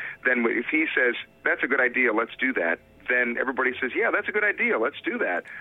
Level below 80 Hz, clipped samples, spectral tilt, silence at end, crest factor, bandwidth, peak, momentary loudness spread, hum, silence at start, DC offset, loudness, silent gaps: -68 dBFS; under 0.1%; -6.5 dB/octave; 0 s; 16 dB; 4 kHz; -10 dBFS; 6 LU; none; 0 s; under 0.1%; -24 LUFS; none